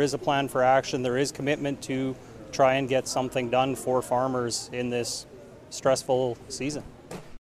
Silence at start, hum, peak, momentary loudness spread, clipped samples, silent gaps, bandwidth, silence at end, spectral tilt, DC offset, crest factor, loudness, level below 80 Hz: 0 s; none; -10 dBFS; 13 LU; under 0.1%; none; 15.5 kHz; 0.05 s; -4.5 dB/octave; under 0.1%; 18 dB; -27 LUFS; -56 dBFS